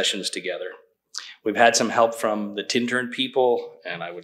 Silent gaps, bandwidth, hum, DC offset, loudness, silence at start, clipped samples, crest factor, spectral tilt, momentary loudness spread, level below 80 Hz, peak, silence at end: none; 15.5 kHz; none; under 0.1%; -23 LUFS; 0 s; under 0.1%; 22 dB; -2.5 dB/octave; 16 LU; -78 dBFS; -2 dBFS; 0 s